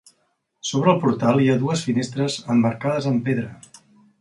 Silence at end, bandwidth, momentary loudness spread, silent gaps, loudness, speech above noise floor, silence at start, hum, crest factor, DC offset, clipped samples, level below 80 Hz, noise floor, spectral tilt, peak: 0.65 s; 11.5 kHz; 8 LU; none; -21 LUFS; 49 dB; 0.65 s; none; 18 dB; under 0.1%; under 0.1%; -62 dBFS; -69 dBFS; -6 dB/octave; -4 dBFS